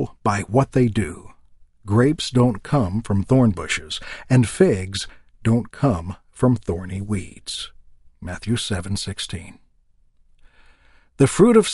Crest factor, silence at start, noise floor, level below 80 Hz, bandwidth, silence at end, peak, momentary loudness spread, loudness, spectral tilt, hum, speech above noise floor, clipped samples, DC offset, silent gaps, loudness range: 20 dB; 0 s; -57 dBFS; -44 dBFS; 11.5 kHz; 0 s; -2 dBFS; 13 LU; -21 LUFS; -6 dB/octave; none; 38 dB; under 0.1%; under 0.1%; none; 9 LU